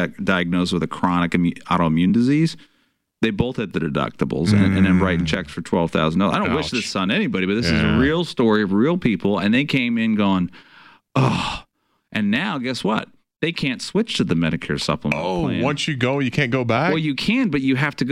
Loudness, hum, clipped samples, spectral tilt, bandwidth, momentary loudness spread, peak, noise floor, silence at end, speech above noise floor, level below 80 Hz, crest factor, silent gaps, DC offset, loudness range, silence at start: -20 LUFS; none; under 0.1%; -6 dB/octave; 12 kHz; 6 LU; -6 dBFS; -65 dBFS; 0 s; 46 dB; -44 dBFS; 14 dB; none; 0.1%; 4 LU; 0 s